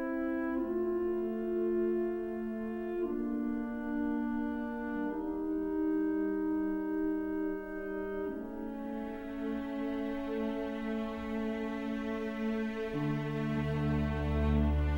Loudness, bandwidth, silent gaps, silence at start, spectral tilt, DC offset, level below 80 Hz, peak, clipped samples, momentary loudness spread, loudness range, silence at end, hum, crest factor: -35 LUFS; 16 kHz; none; 0 s; -9 dB/octave; under 0.1%; -44 dBFS; -18 dBFS; under 0.1%; 6 LU; 3 LU; 0 s; none; 16 dB